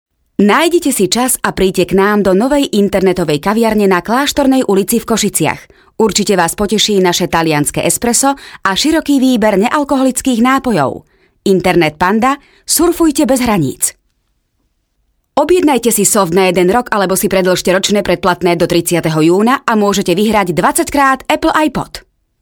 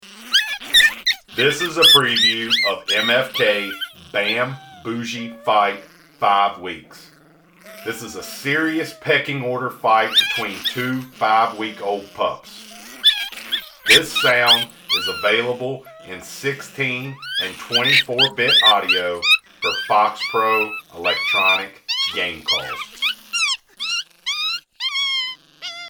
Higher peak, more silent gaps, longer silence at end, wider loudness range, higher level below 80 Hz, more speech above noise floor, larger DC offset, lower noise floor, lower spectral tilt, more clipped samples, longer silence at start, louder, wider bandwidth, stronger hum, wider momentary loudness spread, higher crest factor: about the same, 0 dBFS vs -2 dBFS; neither; first, 0.45 s vs 0 s; second, 2 LU vs 7 LU; first, -40 dBFS vs -60 dBFS; first, 51 dB vs 32 dB; neither; first, -63 dBFS vs -51 dBFS; first, -4 dB/octave vs -2 dB/octave; neither; first, 0.4 s vs 0.05 s; first, -12 LUFS vs -17 LUFS; about the same, over 20 kHz vs over 20 kHz; neither; second, 5 LU vs 15 LU; second, 12 dB vs 18 dB